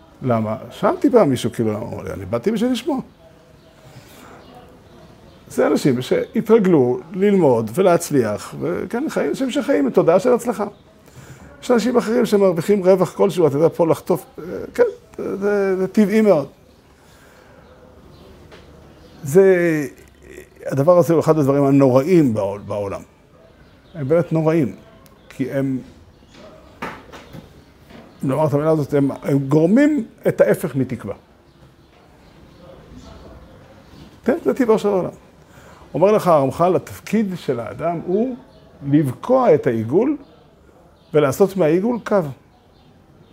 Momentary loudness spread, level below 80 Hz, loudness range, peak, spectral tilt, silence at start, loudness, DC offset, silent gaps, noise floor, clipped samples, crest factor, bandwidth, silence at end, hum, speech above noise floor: 14 LU; -54 dBFS; 8 LU; 0 dBFS; -7 dB/octave; 0.2 s; -18 LUFS; under 0.1%; none; -50 dBFS; under 0.1%; 18 dB; 16 kHz; 1 s; none; 33 dB